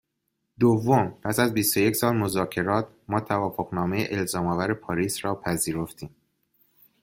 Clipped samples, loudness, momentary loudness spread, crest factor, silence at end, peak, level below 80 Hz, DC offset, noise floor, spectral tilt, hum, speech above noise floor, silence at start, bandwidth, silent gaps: under 0.1%; -25 LUFS; 7 LU; 20 dB; 0.95 s; -6 dBFS; -58 dBFS; under 0.1%; -78 dBFS; -5 dB/octave; none; 53 dB; 0.6 s; 16.5 kHz; none